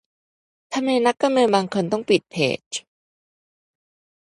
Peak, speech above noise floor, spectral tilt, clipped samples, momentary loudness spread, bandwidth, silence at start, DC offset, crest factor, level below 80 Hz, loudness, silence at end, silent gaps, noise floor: -2 dBFS; over 70 dB; -4.5 dB/octave; under 0.1%; 11 LU; 11.5 kHz; 0.7 s; under 0.1%; 20 dB; -68 dBFS; -21 LUFS; 1.45 s; 2.66-2.71 s; under -90 dBFS